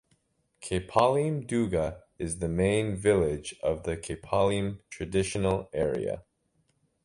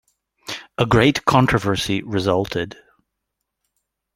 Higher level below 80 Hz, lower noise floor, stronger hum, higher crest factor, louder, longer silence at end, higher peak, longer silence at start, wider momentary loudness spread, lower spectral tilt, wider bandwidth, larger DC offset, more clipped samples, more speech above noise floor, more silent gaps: about the same, -48 dBFS vs -44 dBFS; second, -72 dBFS vs -79 dBFS; neither; about the same, 22 dB vs 20 dB; second, -29 LUFS vs -19 LUFS; second, 0.85 s vs 1.45 s; second, -8 dBFS vs -2 dBFS; first, 0.6 s vs 0.45 s; second, 11 LU vs 16 LU; about the same, -6 dB/octave vs -5.5 dB/octave; second, 11.5 kHz vs 16.5 kHz; neither; neither; second, 44 dB vs 61 dB; neither